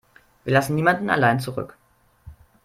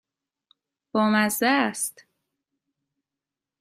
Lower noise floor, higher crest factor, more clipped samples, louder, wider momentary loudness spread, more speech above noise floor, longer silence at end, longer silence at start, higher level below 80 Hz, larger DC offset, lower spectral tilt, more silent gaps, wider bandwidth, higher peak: second, -48 dBFS vs -88 dBFS; about the same, 20 dB vs 22 dB; neither; about the same, -21 LUFS vs -23 LUFS; first, 15 LU vs 9 LU; second, 27 dB vs 66 dB; second, 0.3 s vs 1.7 s; second, 0.45 s vs 0.95 s; first, -54 dBFS vs -74 dBFS; neither; first, -6 dB/octave vs -3.5 dB/octave; neither; about the same, 16 kHz vs 15.5 kHz; first, -2 dBFS vs -6 dBFS